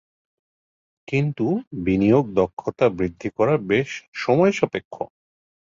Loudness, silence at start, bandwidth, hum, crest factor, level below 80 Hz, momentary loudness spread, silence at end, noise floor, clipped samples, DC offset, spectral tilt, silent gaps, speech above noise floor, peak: -22 LUFS; 1.1 s; 7.6 kHz; none; 18 dB; -50 dBFS; 12 LU; 0.6 s; under -90 dBFS; under 0.1%; under 0.1%; -7.5 dB/octave; 1.67-1.71 s, 2.53-2.57 s, 4.08-4.12 s, 4.85-4.91 s; over 69 dB; -4 dBFS